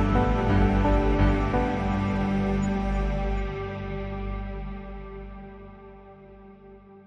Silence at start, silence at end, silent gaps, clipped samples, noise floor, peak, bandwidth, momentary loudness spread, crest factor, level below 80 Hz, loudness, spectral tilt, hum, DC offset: 0 s; 0.05 s; none; under 0.1%; -48 dBFS; -10 dBFS; 7.4 kHz; 20 LU; 16 dB; -30 dBFS; -26 LUFS; -8 dB/octave; 50 Hz at -35 dBFS; under 0.1%